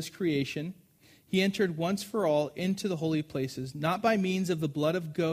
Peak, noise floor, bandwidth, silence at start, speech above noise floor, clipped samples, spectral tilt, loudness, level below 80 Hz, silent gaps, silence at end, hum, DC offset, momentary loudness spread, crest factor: -14 dBFS; -61 dBFS; 15.5 kHz; 0 s; 31 dB; under 0.1%; -6 dB/octave; -30 LUFS; -68 dBFS; none; 0 s; none; under 0.1%; 7 LU; 16 dB